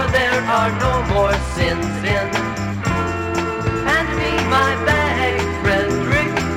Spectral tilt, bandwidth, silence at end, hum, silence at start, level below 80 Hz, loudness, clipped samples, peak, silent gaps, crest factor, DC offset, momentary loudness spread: -5.5 dB/octave; 16.5 kHz; 0 s; none; 0 s; -30 dBFS; -18 LUFS; under 0.1%; -4 dBFS; none; 14 dB; under 0.1%; 5 LU